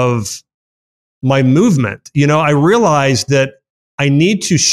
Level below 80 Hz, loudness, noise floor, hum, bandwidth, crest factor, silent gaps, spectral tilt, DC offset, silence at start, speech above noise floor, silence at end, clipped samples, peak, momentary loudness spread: -50 dBFS; -13 LUFS; under -90 dBFS; none; 13 kHz; 12 dB; 0.54-1.21 s, 3.70-3.98 s; -5 dB/octave; under 0.1%; 0 s; over 78 dB; 0 s; under 0.1%; -2 dBFS; 10 LU